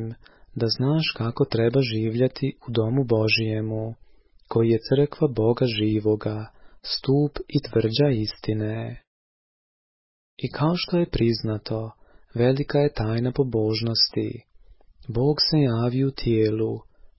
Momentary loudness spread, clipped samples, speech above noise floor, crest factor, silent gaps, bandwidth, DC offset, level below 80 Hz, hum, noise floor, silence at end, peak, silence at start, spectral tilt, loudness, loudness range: 12 LU; under 0.1%; 28 dB; 16 dB; 9.07-10.37 s; 5.8 kHz; under 0.1%; -48 dBFS; none; -51 dBFS; 0.15 s; -8 dBFS; 0 s; -10 dB/octave; -23 LUFS; 4 LU